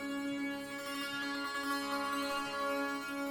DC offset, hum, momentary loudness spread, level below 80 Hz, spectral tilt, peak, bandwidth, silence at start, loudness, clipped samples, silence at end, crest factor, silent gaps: under 0.1%; none; 4 LU; -70 dBFS; -2.5 dB/octave; -26 dBFS; 18 kHz; 0 s; -37 LUFS; under 0.1%; 0 s; 12 dB; none